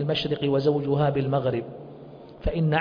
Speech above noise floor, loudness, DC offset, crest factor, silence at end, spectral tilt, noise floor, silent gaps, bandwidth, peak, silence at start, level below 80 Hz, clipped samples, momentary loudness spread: 20 dB; -25 LUFS; under 0.1%; 16 dB; 0 s; -8.5 dB/octave; -44 dBFS; none; 5.2 kHz; -10 dBFS; 0 s; -42 dBFS; under 0.1%; 19 LU